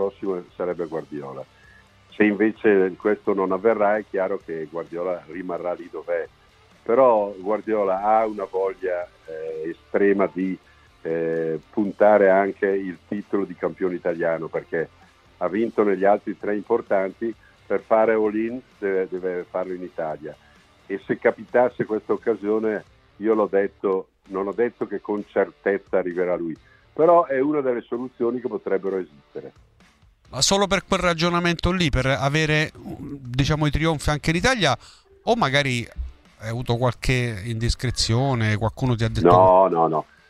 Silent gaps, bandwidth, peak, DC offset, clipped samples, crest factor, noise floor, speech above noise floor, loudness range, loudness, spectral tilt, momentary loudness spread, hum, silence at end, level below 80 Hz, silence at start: none; 14 kHz; -2 dBFS; under 0.1%; under 0.1%; 22 dB; -56 dBFS; 34 dB; 4 LU; -22 LUFS; -5.5 dB/octave; 13 LU; none; 0.25 s; -42 dBFS; 0 s